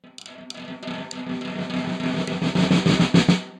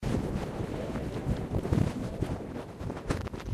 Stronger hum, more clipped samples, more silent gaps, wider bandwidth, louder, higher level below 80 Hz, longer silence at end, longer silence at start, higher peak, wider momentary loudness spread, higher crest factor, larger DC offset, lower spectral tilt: neither; neither; neither; second, 10 kHz vs 15 kHz; first, -22 LUFS vs -34 LUFS; second, -54 dBFS vs -40 dBFS; about the same, 0 s vs 0 s; about the same, 0.05 s vs 0 s; first, -4 dBFS vs -12 dBFS; first, 19 LU vs 9 LU; about the same, 20 dB vs 20 dB; neither; second, -6 dB/octave vs -7.5 dB/octave